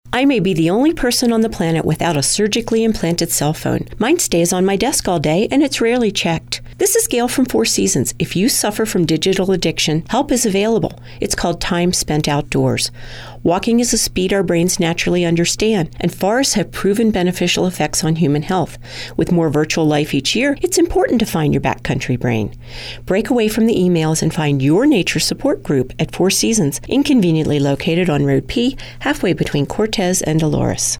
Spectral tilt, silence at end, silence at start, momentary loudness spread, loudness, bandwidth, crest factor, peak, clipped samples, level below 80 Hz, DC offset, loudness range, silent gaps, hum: -4.5 dB/octave; 0 s; 0.05 s; 5 LU; -16 LUFS; 17.5 kHz; 10 dB; -6 dBFS; under 0.1%; -36 dBFS; under 0.1%; 2 LU; none; none